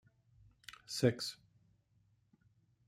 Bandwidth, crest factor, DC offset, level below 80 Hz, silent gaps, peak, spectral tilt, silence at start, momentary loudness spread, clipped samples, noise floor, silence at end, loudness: 15.5 kHz; 26 dB; under 0.1%; -76 dBFS; none; -16 dBFS; -5 dB/octave; 0.7 s; 22 LU; under 0.1%; -74 dBFS; 1.55 s; -37 LUFS